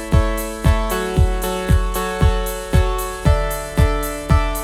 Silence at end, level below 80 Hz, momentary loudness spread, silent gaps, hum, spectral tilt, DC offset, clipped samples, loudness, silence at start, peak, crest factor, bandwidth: 0 s; -20 dBFS; 4 LU; none; none; -5.5 dB/octave; under 0.1%; under 0.1%; -19 LUFS; 0 s; 0 dBFS; 16 dB; 16 kHz